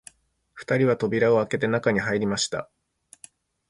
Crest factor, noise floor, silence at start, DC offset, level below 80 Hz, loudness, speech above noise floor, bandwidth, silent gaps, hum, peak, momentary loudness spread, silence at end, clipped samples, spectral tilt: 18 dB; -58 dBFS; 0.55 s; under 0.1%; -60 dBFS; -24 LUFS; 35 dB; 11.5 kHz; none; none; -6 dBFS; 7 LU; 1.05 s; under 0.1%; -5 dB/octave